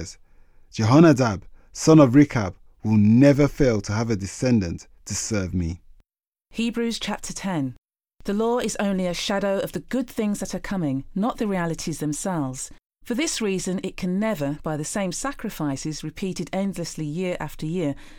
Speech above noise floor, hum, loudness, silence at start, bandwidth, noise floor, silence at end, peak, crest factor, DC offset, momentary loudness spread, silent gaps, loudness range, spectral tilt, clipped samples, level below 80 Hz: 62 dB; none; -23 LUFS; 0 s; 17.5 kHz; -84 dBFS; 0 s; -4 dBFS; 20 dB; under 0.1%; 15 LU; 6.27-6.32 s, 7.78-7.82 s, 12.86-12.90 s; 10 LU; -6 dB/octave; under 0.1%; -44 dBFS